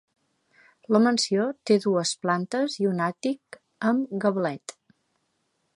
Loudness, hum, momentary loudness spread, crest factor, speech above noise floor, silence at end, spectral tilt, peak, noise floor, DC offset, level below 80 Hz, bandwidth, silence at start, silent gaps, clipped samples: -25 LUFS; none; 9 LU; 20 dB; 49 dB; 1.05 s; -5 dB/octave; -6 dBFS; -74 dBFS; under 0.1%; -78 dBFS; 11.5 kHz; 0.9 s; none; under 0.1%